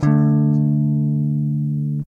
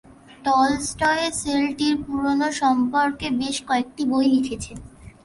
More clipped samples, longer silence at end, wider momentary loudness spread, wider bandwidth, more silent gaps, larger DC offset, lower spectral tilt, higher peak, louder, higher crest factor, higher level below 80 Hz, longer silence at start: neither; about the same, 0.05 s vs 0.15 s; about the same, 6 LU vs 7 LU; second, 2.3 kHz vs 11.5 kHz; neither; neither; first, -11 dB/octave vs -3.5 dB/octave; about the same, -6 dBFS vs -6 dBFS; first, -18 LUFS vs -22 LUFS; about the same, 12 dB vs 16 dB; about the same, -52 dBFS vs -48 dBFS; second, 0 s vs 0.3 s